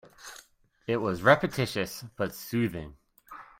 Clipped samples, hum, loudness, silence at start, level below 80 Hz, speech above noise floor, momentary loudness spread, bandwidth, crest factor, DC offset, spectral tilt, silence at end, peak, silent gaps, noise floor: under 0.1%; none; -28 LUFS; 0.2 s; -58 dBFS; 28 dB; 25 LU; 16.5 kHz; 24 dB; under 0.1%; -5.5 dB/octave; 0.15 s; -6 dBFS; none; -56 dBFS